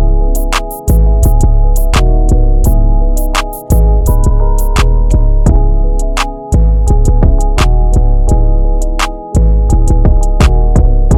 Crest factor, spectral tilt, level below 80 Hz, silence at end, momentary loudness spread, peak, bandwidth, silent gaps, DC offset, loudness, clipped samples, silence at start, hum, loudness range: 8 dB; -6 dB/octave; -8 dBFS; 0 s; 5 LU; 0 dBFS; 15.5 kHz; none; under 0.1%; -12 LUFS; 0.4%; 0 s; none; 0 LU